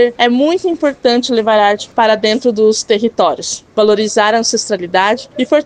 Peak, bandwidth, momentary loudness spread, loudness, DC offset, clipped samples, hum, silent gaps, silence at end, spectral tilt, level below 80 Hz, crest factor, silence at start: 0 dBFS; 10 kHz; 4 LU; -13 LUFS; under 0.1%; under 0.1%; none; none; 0 s; -3 dB/octave; -56 dBFS; 12 dB; 0 s